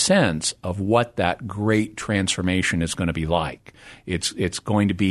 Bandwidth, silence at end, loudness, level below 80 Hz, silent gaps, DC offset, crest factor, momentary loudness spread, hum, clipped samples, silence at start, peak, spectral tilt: 12.5 kHz; 0 s; -23 LUFS; -44 dBFS; none; under 0.1%; 18 dB; 7 LU; none; under 0.1%; 0 s; -4 dBFS; -4.5 dB/octave